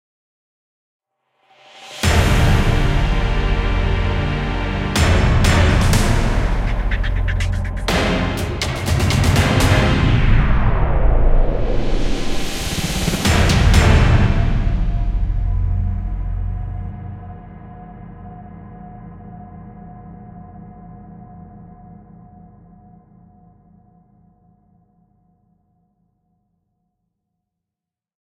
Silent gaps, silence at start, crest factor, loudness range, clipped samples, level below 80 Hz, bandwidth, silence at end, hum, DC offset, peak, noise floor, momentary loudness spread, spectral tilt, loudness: none; 1.75 s; 18 dB; 21 LU; under 0.1%; -20 dBFS; 16 kHz; 6.25 s; none; under 0.1%; 0 dBFS; -87 dBFS; 23 LU; -5.5 dB/octave; -18 LUFS